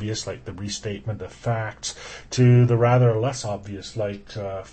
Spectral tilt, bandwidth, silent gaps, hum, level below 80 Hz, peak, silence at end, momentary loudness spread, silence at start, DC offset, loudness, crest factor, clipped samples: -6 dB/octave; 8.8 kHz; none; none; -50 dBFS; -8 dBFS; 0 s; 16 LU; 0 s; under 0.1%; -23 LUFS; 16 dB; under 0.1%